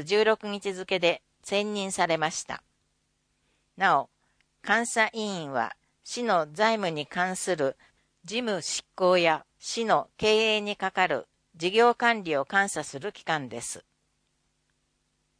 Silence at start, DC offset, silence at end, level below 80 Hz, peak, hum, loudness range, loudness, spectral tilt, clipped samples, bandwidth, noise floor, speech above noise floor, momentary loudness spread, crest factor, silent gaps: 0 s; under 0.1%; 1.6 s; -68 dBFS; -6 dBFS; none; 4 LU; -27 LUFS; -3 dB/octave; under 0.1%; 10.5 kHz; -74 dBFS; 47 dB; 13 LU; 22 dB; none